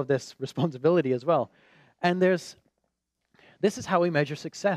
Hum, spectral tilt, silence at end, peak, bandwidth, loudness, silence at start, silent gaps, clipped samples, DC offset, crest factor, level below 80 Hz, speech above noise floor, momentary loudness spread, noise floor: none; -6 dB/octave; 0 s; -8 dBFS; 13.5 kHz; -26 LUFS; 0 s; none; under 0.1%; under 0.1%; 18 dB; -74 dBFS; 53 dB; 8 LU; -79 dBFS